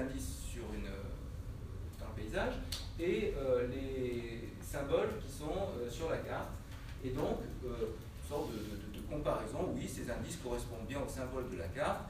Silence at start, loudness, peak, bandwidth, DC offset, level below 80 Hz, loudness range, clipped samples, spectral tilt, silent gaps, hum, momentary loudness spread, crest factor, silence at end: 0 s; -40 LUFS; -22 dBFS; 15.5 kHz; under 0.1%; -48 dBFS; 3 LU; under 0.1%; -5.5 dB/octave; none; none; 10 LU; 18 dB; 0 s